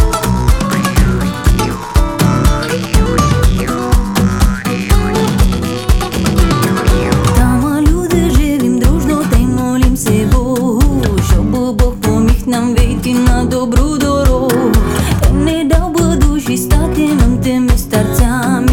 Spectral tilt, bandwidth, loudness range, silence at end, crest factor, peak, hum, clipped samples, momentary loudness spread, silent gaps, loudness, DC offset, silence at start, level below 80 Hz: -6 dB/octave; 17.5 kHz; 1 LU; 0 s; 10 dB; 0 dBFS; none; under 0.1%; 3 LU; none; -13 LUFS; under 0.1%; 0 s; -16 dBFS